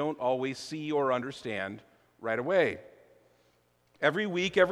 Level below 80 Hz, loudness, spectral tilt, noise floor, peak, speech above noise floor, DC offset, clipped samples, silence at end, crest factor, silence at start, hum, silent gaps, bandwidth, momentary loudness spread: -70 dBFS; -30 LUFS; -5 dB/octave; -69 dBFS; -10 dBFS; 39 dB; under 0.1%; under 0.1%; 0 s; 20 dB; 0 s; 60 Hz at -65 dBFS; none; 12.5 kHz; 12 LU